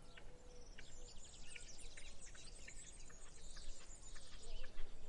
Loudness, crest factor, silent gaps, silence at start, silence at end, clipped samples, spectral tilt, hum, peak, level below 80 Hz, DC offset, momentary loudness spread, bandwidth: -58 LUFS; 16 dB; none; 0 s; 0 s; under 0.1%; -2 dB/octave; none; -30 dBFS; -54 dBFS; under 0.1%; 4 LU; 10.5 kHz